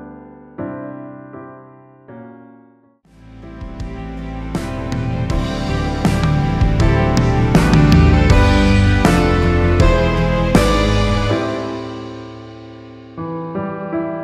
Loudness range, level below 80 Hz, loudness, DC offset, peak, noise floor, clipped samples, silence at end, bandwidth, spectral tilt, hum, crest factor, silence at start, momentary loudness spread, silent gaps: 21 LU; -22 dBFS; -16 LUFS; under 0.1%; 0 dBFS; -51 dBFS; under 0.1%; 0 s; 14 kHz; -6.5 dB/octave; none; 16 dB; 0 s; 23 LU; none